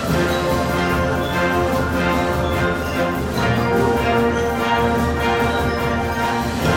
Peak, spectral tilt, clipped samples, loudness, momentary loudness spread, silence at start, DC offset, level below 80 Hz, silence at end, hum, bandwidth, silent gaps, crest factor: -6 dBFS; -5.5 dB/octave; under 0.1%; -19 LUFS; 3 LU; 0 s; under 0.1%; -34 dBFS; 0 s; none; 17 kHz; none; 12 dB